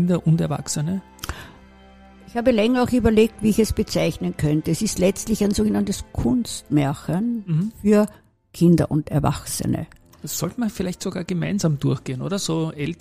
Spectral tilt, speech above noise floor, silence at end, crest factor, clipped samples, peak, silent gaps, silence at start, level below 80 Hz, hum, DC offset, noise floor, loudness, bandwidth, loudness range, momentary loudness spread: -6 dB/octave; 26 dB; 0.05 s; 18 dB; under 0.1%; -4 dBFS; none; 0 s; -40 dBFS; none; 0.2%; -47 dBFS; -22 LUFS; 15.5 kHz; 4 LU; 9 LU